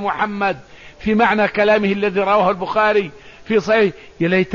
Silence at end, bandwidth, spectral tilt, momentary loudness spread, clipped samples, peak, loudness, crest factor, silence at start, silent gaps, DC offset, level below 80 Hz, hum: 0 s; 7.2 kHz; -6.5 dB/octave; 7 LU; under 0.1%; -4 dBFS; -17 LUFS; 14 dB; 0 s; none; 0.3%; -48 dBFS; none